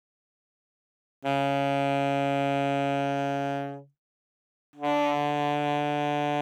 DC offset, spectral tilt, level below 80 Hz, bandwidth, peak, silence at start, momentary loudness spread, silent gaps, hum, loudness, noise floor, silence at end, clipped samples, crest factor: under 0.1%; -6.5 dB/octave; under -90 dBFS; 13.5 kHz; -14 dBFS; 1.2 s; 7 LU; 3.98-4.73 s; none; -27 LUFS; under -90 dBFS; 0 s; under 0.1%; 14 dB